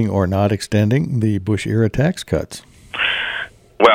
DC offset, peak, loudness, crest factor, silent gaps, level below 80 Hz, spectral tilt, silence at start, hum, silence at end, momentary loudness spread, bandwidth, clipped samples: under 0.1%; 0 dBFS; -18 LUFS; 18 dB; none; -42 dBFS; -6 dB/octave; 0 s; none; 0 s; 12 LU; 15.5 kHz; under 0.1%